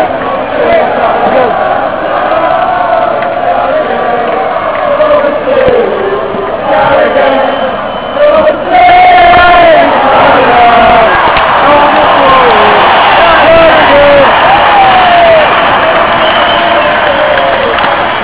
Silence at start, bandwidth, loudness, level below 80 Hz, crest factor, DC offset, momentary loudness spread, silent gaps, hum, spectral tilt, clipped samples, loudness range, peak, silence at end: 0 s; 4 kHz; -5 LUFS; -32 dBFS; 6 dB; 2%; 8 LU; none; none; -8 dB/octave; 7%; 6 LU; 0 dBFS; 0 s